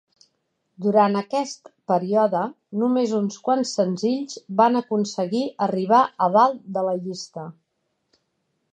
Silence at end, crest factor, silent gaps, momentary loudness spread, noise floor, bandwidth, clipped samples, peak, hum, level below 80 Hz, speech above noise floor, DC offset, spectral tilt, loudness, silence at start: 1.2 s; 20 dB; none; 11 LU; -74 dBFS; 9.4 kHz; under 0.1%; -4 dBFS; none; -76 dBFS; 53 dB; under 0.1%; -6 dB/octave; -22 LUFS; 0.8 s